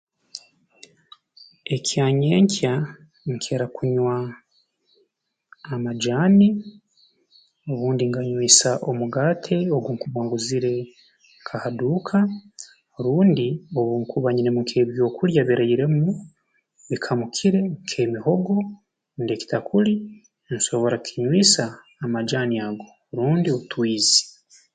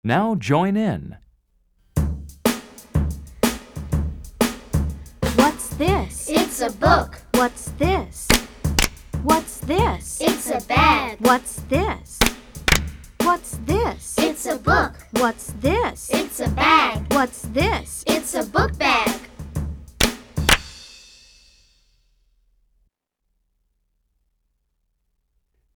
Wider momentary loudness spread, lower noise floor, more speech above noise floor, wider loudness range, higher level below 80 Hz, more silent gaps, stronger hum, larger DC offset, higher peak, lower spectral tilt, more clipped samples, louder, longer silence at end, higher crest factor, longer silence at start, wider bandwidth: first, 17 LU vs 10 LU; about the same, -72 dBFS vs -74 dBFS; about the same, 51 dB vs 54 dB; about the same, 4 LU vs 5 LU; second, -64 dBFS vs -32 dBFS; neither; neither; neither; about the same, 0 dBFS vs 0 dBFS; about the same, -4.5 dB/octave vs -4 dB/octave; neither; about the same, -21 LUFS vs -21 LUFS; second, 0.45 s vs 4.8 s; about the same, 22 dB vs 22 dB; first, 0.35 s vs 0.05 s; second, 9.6 kHz vs over 20 kHz